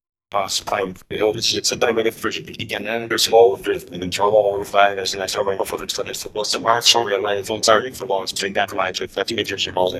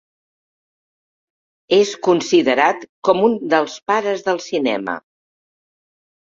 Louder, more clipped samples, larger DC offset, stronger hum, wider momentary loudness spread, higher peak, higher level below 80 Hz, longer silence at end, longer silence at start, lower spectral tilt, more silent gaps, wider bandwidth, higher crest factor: about the same, -19 LUFS vs -17 LUFS; neither; neither; neither; first, 11 LU vs 7 LU; about the same, 0 dBFS vs -2 dBFS; first, -54 dBFS vs -66 dBFS; second, 0 s vs 1.3 s; second, 0.35 s vs 1.7 s; second, -2 dB/octave vs -4 dB/octave; second, none vs 2.89-3.02 s, 3.82-3.86 s; first, 15.5 kHz vs 7.6 kHz; about the same, 20 dB vs 18 dB